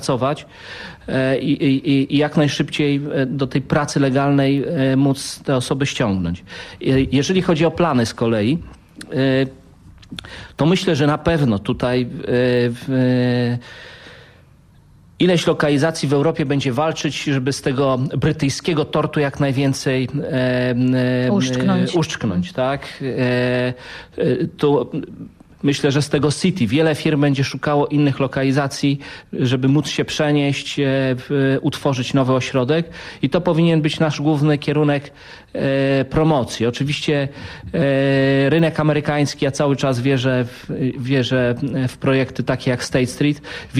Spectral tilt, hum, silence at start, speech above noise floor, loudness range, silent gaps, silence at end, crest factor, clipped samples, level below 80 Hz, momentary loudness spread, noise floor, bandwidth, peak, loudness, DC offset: -6 dB/octave; none; 0 s; 31 dB; 2 LU; none; 0 s; 16 dB; under 0.1%; -46 dBFS; 8 LU; -49 dBFS; 13.5 kHz; -4 dBFS; -18 LUFS; under 0.1%